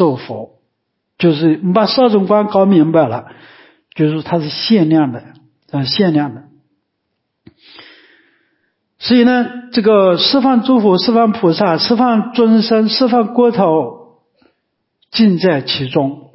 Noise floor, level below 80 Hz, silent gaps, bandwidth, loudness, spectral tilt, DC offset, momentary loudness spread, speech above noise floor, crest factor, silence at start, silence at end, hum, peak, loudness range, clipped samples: -71 dBFS; -58 dBFS; none; 5.8 kHz; -13 LUFS; -10 dB/octave; under 0.1%; 10 LU; 59 dB; 12 dB; 0 s; 0.15 s; none; -2 dBFS; 8 LU; under 0.1%